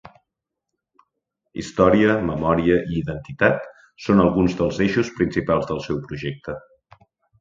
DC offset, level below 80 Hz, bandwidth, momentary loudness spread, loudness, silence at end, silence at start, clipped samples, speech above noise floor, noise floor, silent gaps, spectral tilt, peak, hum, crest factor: under 0.1%; -44 dBFS; 7.6 kHz; 16 LU; -20 LUFS; 0.8 s; 1.55 s; under 0.1%; 63 dB; -83 dBFS; none; -7 dB/octave; -2 dBFS; none; 20 dB